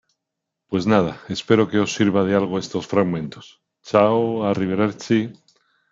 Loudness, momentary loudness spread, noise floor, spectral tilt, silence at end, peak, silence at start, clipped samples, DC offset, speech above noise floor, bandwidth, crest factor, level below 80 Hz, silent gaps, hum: -20 LUFS; 9 LU; -82 dBFS; -5.5 dB/octave; 0.6 s; -2 dBFS; 0.7 s; under 0.1%; under 0.1%; 62 dB; 7.8 kHz; 20 dB; -60 dBFS; none; none